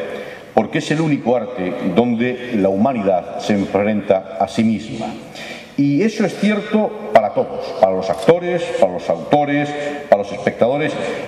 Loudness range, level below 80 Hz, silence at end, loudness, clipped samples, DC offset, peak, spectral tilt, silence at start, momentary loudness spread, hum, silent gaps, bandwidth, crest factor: 2 LU; -56 dBFS; 0 s; -18 LUFS; under 0.1%; under 0.1%; 0 dBFS; -6.5 dB/octave; 0 s; 8 LU; none; none; 12.5 kHz; 18 dB